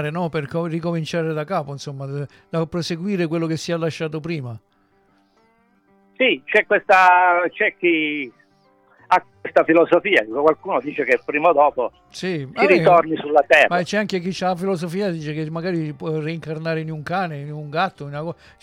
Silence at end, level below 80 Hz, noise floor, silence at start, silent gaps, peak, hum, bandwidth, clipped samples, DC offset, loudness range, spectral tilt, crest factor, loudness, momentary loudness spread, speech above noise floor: 0.3 s; -60 dBFS; -60 dBFS; 0 s; none; -4 dBFS; none; 15 kHz; under 0.1%; under 0.1%; 8 LU; -6 dB/octave; 18 dB; -19 LUFS; 14 LU; 40 dB